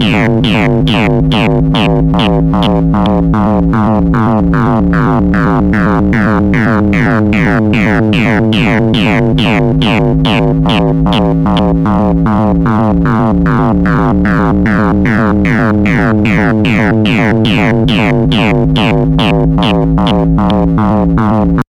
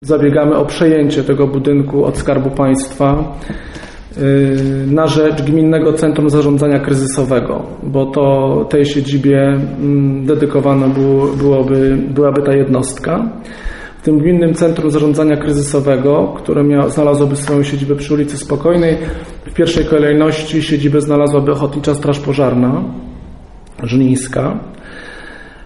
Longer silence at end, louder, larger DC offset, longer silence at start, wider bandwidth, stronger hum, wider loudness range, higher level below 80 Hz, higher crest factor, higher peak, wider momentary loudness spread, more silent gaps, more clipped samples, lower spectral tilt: about the same, 0.05 s vs 0 s; first, -10 LUFS vs -13 LUFS; neither; about the same, 0 s vs 0 s; second, 10 kHz vs 11.5 kHz; neither; second, 0 LU vs 3 LU; first, -22 dBFS vs -32 dBFS; second, 6 dB vs 12 dB; about the same, -2 dBFS vs 0 dBFS; second, 1 LU vs 12 LU; neither; neither; about the same, -8 dB/octave vs -7 dB/octave